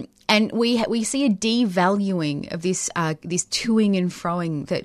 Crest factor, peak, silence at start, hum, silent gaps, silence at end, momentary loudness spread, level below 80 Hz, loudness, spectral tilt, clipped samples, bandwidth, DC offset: 18 dB; -4 dBFS; 0 s; none; none; 0 s; 6 LU; -58 dBFS; -22 LUFS; -4.5 dB/octave; under 0.1%; 13.5 kHz; under 0.1%